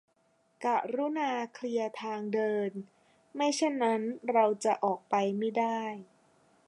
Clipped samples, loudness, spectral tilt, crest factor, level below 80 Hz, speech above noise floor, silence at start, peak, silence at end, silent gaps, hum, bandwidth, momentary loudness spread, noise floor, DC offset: under 0.1%; -31 LUFS; -4.5 dB/octave; 18 dB; -86 dBFS; 40 dB; 0.6 s; -12 dBFS; 0.65 s; none; none; 11.5 kHz; 9 LU; -71 dBFS; under 0.1%